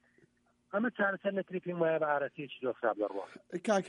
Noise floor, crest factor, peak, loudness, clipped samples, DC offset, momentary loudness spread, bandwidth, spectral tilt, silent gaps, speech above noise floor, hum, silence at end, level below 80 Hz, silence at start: -70 dBFS; 16 dB; -18 dBFS; -34 LUFS; under 0.1%; under 0.1%; 8 LU; 11 kHz; -5.5 dB/octave; none; 37 dB; none; 0 s; -84 dBFS; 0.75 s